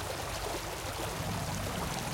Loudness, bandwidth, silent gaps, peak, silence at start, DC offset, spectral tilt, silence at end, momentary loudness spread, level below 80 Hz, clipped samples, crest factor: -36 LUFS; 17 kHz; none; -22 dBFS; 0 s; under 0.1%; -3.5 dB/octave; 0 s; 2 LU; -48 dBFS; under 0.1%; 14 dB